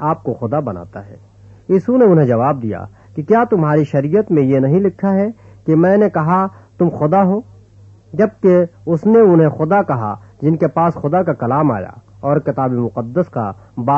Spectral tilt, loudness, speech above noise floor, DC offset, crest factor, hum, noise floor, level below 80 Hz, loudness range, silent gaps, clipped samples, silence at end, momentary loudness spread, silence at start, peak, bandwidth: -11 dB/octave; -15 LUFS; 29 dB; under 0.1%; 14 dB; none; -43 dBFS; -52 dBFS; 3 LU; none; under 0.1%; 0 s; 13 LU; 0 s; -2 dBFS; 7 kHz